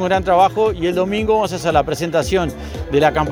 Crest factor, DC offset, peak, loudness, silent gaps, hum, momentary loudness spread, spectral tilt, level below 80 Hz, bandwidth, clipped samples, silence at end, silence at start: 16 dB; under 0.1%; 0 dBFS; -17 LUFS; none; none; 6 LU; -5.5 dB/octave; -34 dBFS; over 20 kHz; under 0.1%; 0 s; 0 s